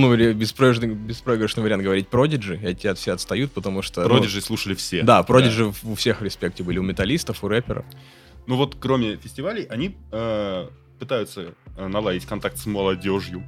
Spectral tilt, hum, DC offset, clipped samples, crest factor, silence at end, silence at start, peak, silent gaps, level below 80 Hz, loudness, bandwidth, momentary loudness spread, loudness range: -5.5 dB/octave; none; under 0.1%; under 0.1%; 22 dB; 0 s; 0 s; 0 dBFS; none; -44 dBFS; -22 LUFS; 16 kHz; 12 LU; 7 LU